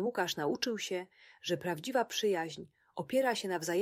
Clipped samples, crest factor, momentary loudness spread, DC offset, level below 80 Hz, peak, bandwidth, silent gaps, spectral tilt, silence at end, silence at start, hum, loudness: under 0.1%; 18 dB; 12 LU; under 0.1%; -78 dBFS; -18 dBFS; 16 kHz; none; -3.5 dB/octave; 0 s; 0 s; none; -34 LUFS